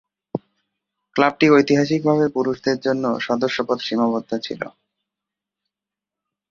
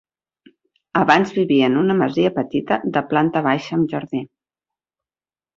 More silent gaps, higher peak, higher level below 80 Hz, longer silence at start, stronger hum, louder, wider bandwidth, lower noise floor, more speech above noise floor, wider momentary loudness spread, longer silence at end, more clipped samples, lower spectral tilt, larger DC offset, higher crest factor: neither; about the same, -2 dBFS vs 0 dBFS; about the same, -62 dBFS vs -60 dBFS; second, 0.35 s vs 0.95 s; first, 50 Hz at -50 dBFS vs none; about the same, -19 LUFS vs -19 LUFS; about the same, 7.4 kHz vs 7.4 kHz; about the same, -87 dBFS vs under -90 dBFS; second, 68 dB vs over 72 dB; first, 17 LU vs 9 LU; first, 1.8 s vs 1.3 s; neither; about the same, -6 dB/octave vs -7 dB/octave; neither; about the same, 20 dB vs 20 dB